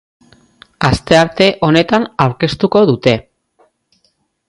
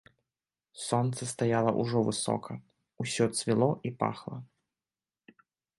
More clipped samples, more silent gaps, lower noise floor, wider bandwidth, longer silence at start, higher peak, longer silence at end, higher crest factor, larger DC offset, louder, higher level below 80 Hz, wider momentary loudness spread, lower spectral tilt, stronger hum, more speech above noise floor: neither; neither; second, -62 dBFS vs under -90 dBFS; about the same, 11.5 kHz vs 11.5 kHz; about the same, 0.8 s vs 0.75 s; first, 0 dBFS vs -12 dBFS; about the same, 1.25 s vs 1.35 s; second, 14 dB vs 20 dB; neither; first, -13 LUFS vs -30 LUFS; first, -40 dBFS vs -68 dBFS; second, 5 LU vs 15 LU; about the same, -6 dB/octave vs -5.5 dB/octave; neither; second, 50 dB vs over 60 dB